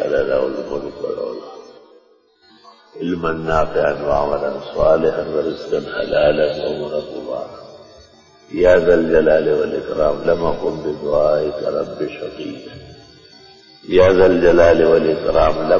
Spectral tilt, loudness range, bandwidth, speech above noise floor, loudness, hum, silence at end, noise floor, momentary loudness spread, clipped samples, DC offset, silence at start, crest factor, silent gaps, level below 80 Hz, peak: -7 dB/octave; 7 LU; 7.6 kHz; 38 dB; -17 LUFS; none; 0 s; -54 dBFS; 16 LU; under 0.1%; under 0.1%; 0 s; 16 dB; none; -38 dBFS; 0 dBFS